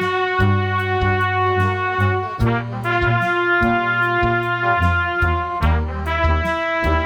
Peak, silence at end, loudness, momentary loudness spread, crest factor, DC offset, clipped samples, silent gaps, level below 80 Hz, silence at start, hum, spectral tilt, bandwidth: -4 dBFS; 0 s; -18 LUFS; 3 LU; 14 dB; under 0.1%; under 0.1%; none; -28 dBFS; 0 s; none; -7.5 dB/octave; 11.5 kHz